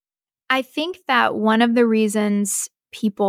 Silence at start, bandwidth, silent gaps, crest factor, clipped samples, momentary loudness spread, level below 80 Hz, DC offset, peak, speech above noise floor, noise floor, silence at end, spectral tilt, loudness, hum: 0.5 s; 16 kHz; none; 16 dB; under 0.1%; 10 LU; -70 dBFS; under 0.1%; -4 dBFS; 51 dB; -70 dBFS; 0 s; -4 dB/octave; -19 LUFS; none